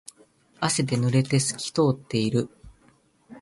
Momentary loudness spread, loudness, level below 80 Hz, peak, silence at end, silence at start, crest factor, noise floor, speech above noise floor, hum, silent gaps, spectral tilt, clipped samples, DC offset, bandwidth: 6 LU; -24 LUFS; -58 dBFS; -8 dBFS; 0 s; 0.6 s; 18 dB; -61 dBFS; 37 dB; none; none; -5 dB/octave; under 0.1%; under 0.1%; 11.5 kHz